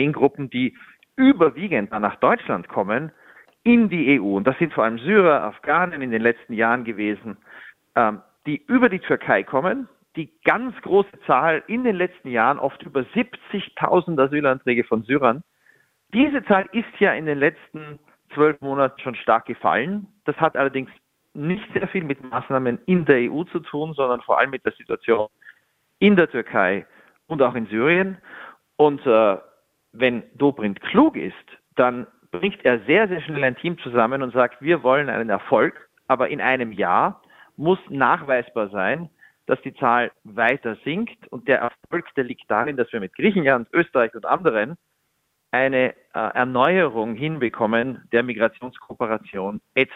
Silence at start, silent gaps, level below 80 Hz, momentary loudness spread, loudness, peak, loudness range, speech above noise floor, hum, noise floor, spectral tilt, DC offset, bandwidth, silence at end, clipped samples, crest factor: 0 s; none; -62 dBFS; 11 LU; -21 LUFS; -2 dBFS; 3 LU; 51 dB; none; -71 dBFS; -8.5 dB/octave; under 0.1%; 4.2 kHz; 0 s; under 0.1%; 20 dB